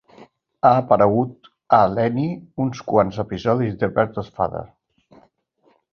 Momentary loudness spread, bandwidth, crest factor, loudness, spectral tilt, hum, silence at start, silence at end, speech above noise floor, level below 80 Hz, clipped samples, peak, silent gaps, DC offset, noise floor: 10 LU; 6.8 kHz; 20 dB; -20 LUFS; -8.5 dB/octave; none; 0.2 s; 1.25 s; 43 dB; -52 dBFS; under 0.1%; -2 dBFS; none; under 0.1%; -62 dBFS